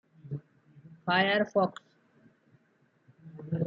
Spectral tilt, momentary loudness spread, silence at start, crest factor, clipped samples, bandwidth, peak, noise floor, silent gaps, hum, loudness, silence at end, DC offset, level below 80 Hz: -7 dB/octave; 23 LU; 0.25 s; 20 dB; under 0.1%; 7.6 kHz; -14 dBFS; -69 dBFS; none; none; -30 LUFS; 0 s; under 0.1%; -76 dBFS